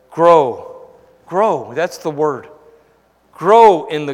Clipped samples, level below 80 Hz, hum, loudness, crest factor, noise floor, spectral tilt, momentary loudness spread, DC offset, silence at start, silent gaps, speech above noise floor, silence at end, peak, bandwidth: 0.2%; -60 dBFS; none; -14 LUFS; 16 dB; -55 dBFS; -5.5 dB/octave; 13 LU; under 0.1%; 0.15 s; none; 42 dB; 0 s; 0 dBFS; 14 kHz